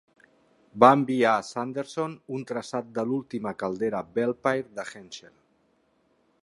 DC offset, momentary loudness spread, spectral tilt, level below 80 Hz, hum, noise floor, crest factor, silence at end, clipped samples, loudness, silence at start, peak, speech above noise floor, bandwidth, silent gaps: under 0.1%; 19 LU; -6 dB/octave; -70 dBFS; none; -68 dBFS; 26 dB; 1.25 s; under 0.1%; -26 LUFS; 0.75 s; -2 dBFS; 42 dB; 11.5 kHz; none